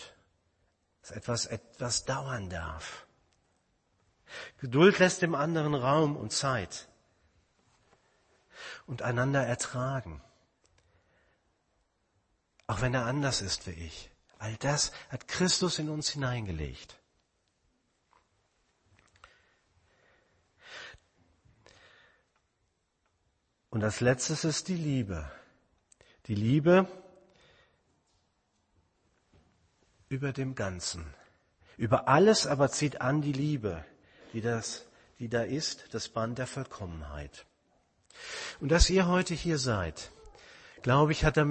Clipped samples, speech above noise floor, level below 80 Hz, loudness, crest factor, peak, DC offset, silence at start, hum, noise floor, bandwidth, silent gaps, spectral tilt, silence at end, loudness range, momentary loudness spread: under 0.1%; 47 dB; -46 dBFS; -30 LUFS; 26 dB; -8 dBFS; under 0.1%; 0 s; none; -77 dBFS; 8.8 kHz; none; -4.5 dB/octave; 0 s; 11 LU; 21 LU